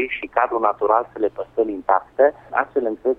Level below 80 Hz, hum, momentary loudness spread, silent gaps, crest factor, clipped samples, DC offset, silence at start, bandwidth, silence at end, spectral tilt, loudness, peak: -56 dBFS; none; 6 LU; none; 16 dB; under 0.1%; under 0.1%; 0 s; 3.9 kHz; 0.05 s; -7 dB/octave; -21 LUFS; -4 dBFS